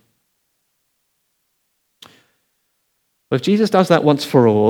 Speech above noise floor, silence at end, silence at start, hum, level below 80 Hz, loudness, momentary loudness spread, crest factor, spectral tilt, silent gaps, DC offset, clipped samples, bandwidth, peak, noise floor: 55 dB; 0 s; 3.3 s; none; -70 dBFS; -15 LUFS; 7 LU; 20 dB; -6.5 dB/octave; none; under 0.1%; under 0.1%; 19 kHz; 0 dBFS; -69 dBFS